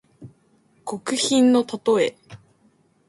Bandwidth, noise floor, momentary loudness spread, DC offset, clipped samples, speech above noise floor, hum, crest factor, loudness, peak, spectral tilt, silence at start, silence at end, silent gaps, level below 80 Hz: 11.5 kHz; -61 dBFS; 15 LU; under 0.1%; under 0.1%; 41 dB; none; 16 dB; -20 LUFS; -8 dBFS; -3.5 dB/octave; 0.2 s; 0.7 s; none; -66 dBFS